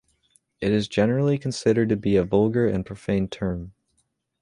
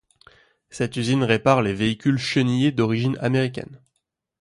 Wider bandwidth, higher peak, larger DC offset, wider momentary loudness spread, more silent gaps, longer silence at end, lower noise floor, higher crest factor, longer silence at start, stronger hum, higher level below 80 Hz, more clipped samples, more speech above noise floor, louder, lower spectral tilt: about the same, 11 kHz vs 11.5 kHz; about the same, -6 dBFS vs -4 dBFS; neither; about the same, 9 LU vs 10 LU; neither; about the same, 0.7 s vs 0.65 s; second, -71 dBFS vs -77 dBFS; about the same, 18 dB vs 18 dB; second, 0.6 s vs 0.75 s; neither; first, -48 dBFS vs -54 dBFS; neither; second, 49 dB vs 56 dB; about the same, -23 LUFS vs -21 LUFS; about the same, -7 dB/octave vs -6.5 dB/octave